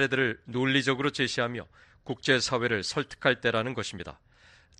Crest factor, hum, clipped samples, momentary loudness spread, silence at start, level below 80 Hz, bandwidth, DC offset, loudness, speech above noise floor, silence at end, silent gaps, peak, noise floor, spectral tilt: 22 dB; none; under 0.1%; 14 LU; 0 s; -60 dBFS; 10.5 kHz; under 0.1%; -28 LUFS; 29 dB; 0.65 s; none; -8 dBFS; -58 dBFS; -4 dB/octave